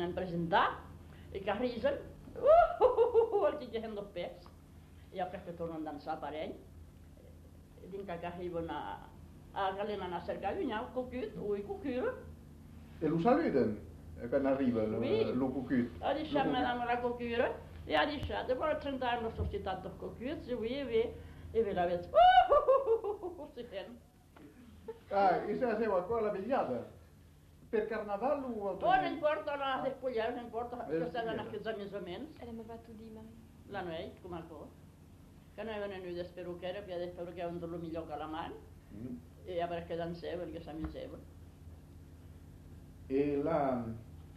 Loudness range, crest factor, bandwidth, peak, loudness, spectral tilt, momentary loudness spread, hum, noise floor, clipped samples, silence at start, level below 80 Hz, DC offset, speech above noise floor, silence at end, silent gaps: 13 LU; 22 dB; 13.5 kHz; -14 dBFS; -35 LUFS; -7 dB/octave; 21 LU; 50 Hz at -65 dBFS; -59 dBFS; under 0.1%; 0 s; -56 dBFS; under 0.1%; 25 dB; 0 s; none